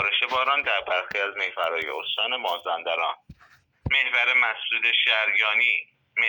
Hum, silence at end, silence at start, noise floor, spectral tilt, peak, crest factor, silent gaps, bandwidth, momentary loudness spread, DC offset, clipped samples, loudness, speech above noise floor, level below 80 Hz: none; 0 s; 0 s; -58 dBFS; -3 dB/octave; -8 dBFS; 16 dB; none; over 20 kHz; 9 LU; under 0.1%; under 0.1%; -22 LUFS; 34 dB; -56 dBFS